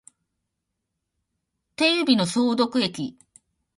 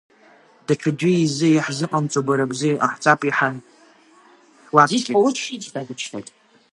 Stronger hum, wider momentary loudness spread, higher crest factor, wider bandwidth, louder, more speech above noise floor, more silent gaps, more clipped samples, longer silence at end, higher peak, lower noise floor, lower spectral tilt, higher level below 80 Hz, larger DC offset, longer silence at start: neither; about the same, 14 LU vs 14 LU; about the same, 20 dB vs 20 dB; about the same, 11.5 kHz vs 11.5 kHz; about the same, -22 LUFS vs -20 LUFS; first, 59 dB vs 33 dB; neither; neither; first, 0.65 s vs 0.5 s; second, -6 dBFS vs 0 dBFS; first, -81 dBFS vs -52 dBFS; about the same, -4 dB/octave vs -5 dB/octave; about the same, -68 dBFS vs -70 dBFS; neither; first, 1.8 s vs 0.7 s